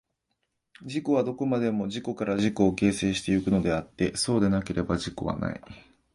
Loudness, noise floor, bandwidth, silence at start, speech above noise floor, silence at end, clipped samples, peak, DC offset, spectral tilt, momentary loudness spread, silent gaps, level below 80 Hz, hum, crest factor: -27 LUFS; -79 dBFS; 11.5 kHz; 0.8 s; 52 dB; 0.35 s; under 0.1%; -8 dBFS; under 0.1%; -5.5 dB/octave; 9 LU; none; -50 dBFS; none; 20 dB